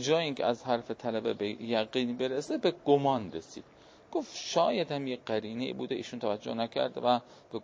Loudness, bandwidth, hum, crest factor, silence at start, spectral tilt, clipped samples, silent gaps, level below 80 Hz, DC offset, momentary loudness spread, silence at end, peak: -32 LUFS; 8 kHz; none; 20 dB; 0 s; -5 dB/octave; under 0.1%; none; -70 dBFS; under 0.1%; 9 LU; 0 s; -12 dBFS